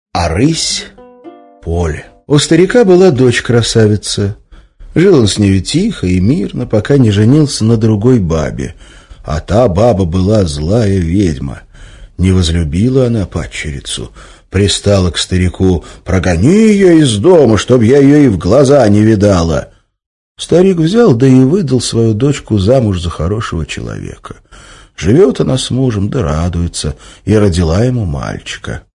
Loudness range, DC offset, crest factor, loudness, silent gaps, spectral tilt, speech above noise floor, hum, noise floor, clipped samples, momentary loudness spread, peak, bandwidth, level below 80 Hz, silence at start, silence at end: 6 LU; under 0.1%; 10 dB; -10 LUFS; 20.06-20.35 s; -6 dB/octave; 26 dB; none; -35 dBFS; 1%; 14 LU; 0 dBFS; 11 kHz; -30 dBFS; 0.15 s; 0.15 s